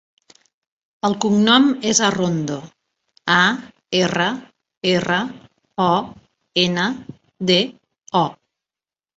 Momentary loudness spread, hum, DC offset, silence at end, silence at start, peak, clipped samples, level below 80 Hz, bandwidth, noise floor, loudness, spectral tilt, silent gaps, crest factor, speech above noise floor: 14 LU; none; under 0.1%; 0.85 s; 1.05 s; -2 dBFS; under 0.1%; -60 dBFS; 8.2 kHz; under -90 dBFS; -19 LUFS; -3.5 dB/octave; 4.77-4.81 s; 20 dB; over 72 dB